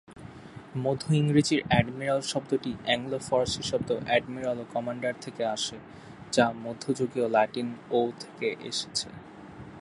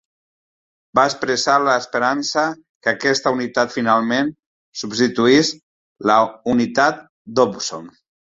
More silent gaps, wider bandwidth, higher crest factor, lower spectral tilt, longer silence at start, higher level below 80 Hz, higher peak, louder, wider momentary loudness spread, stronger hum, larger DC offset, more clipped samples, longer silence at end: second, none vs 2.69-2.81 s, 4.46-4.73 s, 5.63-5.95 s, 7.09-7.25 s; first, 11.5 kHz vs 8 kHz; about the same, 22 dB vs 18 dB; first, -5 dB/octave vs -3.5 dB/octave; second, 0.1 s vs 0.95 s; about the same, -56 dBFS vs -60 dBFS; second, -6 dBFS vs 0 dBFS; second, -28 LUFS vs -18 LUFS; first, 21 LU vs 10 LU; neither; neither; neither; second, 0 s vs 0.5 s